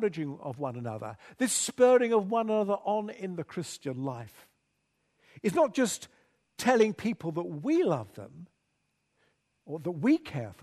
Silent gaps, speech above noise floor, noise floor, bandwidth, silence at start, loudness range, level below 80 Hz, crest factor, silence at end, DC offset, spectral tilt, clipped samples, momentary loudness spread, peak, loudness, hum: none; 48 dB; -77 dBFS; 13.5 kHz; 0 s; 5 LU; -72 dBFS; 20 dB; 0.1 s; under 0.1%; -5 dB/octave; under 0.1%; 16 LU; -10 dBFS; -29 LUFS; none